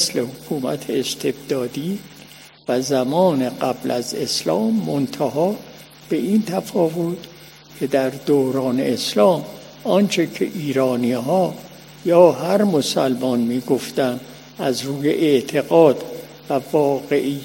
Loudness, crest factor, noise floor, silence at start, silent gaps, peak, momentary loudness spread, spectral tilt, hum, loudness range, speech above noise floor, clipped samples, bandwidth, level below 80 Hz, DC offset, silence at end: -20 LUFS; 20 dB; -43 dBFS; 0 s; none; 0 dBFS; 12 LU; -5 dB/octave; none; 4 LU; 25 dB; under 0.1%; 16.5 kHz; -60 dBFS; under 0.1%; 0 s